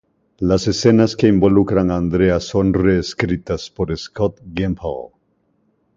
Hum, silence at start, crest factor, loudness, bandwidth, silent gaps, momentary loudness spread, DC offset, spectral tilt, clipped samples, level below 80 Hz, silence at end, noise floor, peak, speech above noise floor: none; 0.4 s; 16 dB; -17 LUFS; 7.8 kHz; none; 10 LU; under 0.1%; -6.5 dB/octave; under 0.1%; -36 dBFS; 0.9 s; -64 dBFS; 0 dBFS; 47 dB